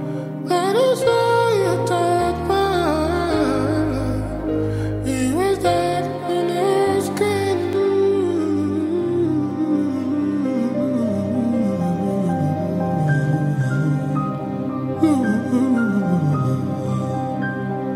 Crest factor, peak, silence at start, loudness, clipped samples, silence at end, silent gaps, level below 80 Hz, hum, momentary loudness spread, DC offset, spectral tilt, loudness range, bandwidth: 14 dB; -6 dBFS; 0 s; -20 LUFS; under 0.1%; 0 s; none; -42 dBFS; none; 6 LU; under 0.1%; -7 dB/octave; 2 LU; 16 kHz